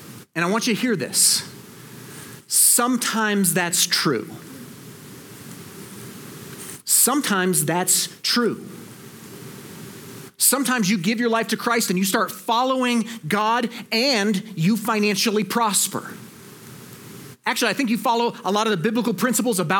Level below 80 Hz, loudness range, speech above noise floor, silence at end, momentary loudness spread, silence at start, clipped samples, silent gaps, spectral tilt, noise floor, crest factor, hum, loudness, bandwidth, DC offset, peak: -74 dBFS; 4 LU; 21 dB; 0 s; 23 LU; 0 s; under 0.1%; none; -2.5 dB/octave; -42 dBFS; 20 dB; none; -20 LUFS; 19 kHz; under 0.1%; -4 dBFS